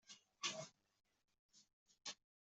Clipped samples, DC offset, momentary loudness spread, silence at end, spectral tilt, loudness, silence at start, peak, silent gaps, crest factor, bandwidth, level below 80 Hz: under 0.1%; under 0.1%; 13 LU; 0.35 s; -0.5 dB/octave; -50 LUFS; 0.05 s; -30 dBFS; 1.39-1.49 s, 1.73-1.86 s; 26 dB; 8.2 kHz; under -90 dBFS